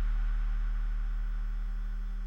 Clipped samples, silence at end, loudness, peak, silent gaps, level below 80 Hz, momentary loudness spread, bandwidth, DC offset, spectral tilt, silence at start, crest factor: under 0.1%; 0 s; -37 LUFS; -24 dBFS; none; -30 dBFS; 4 LU; 3.7 kHz; under 0.1%; -7 dB/octave; 0 s; 6 dB